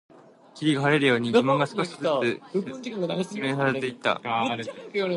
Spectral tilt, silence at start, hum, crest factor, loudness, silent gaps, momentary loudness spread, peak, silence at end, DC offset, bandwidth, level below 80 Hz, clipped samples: -5.5 dB/octave; 0.55 s; none; 18 dB; -25 LUFS; none; 10 LU; -8 dBFS; 0 s; under 0.1%; 11.5 kHz; -72 dBFS; under 0.1%